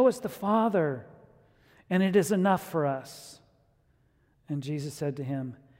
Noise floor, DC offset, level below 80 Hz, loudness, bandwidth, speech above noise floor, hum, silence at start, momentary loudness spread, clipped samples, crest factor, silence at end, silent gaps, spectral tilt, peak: -67 dBFS; under 0.1%; -70 dBFS; -28 LUFS; 16 kHz; 39 dB; none; 0 s; 14 LU; under 0.1%; 18 dB; 0.25 s; none; -6.5 dB/octave; -12 dBFS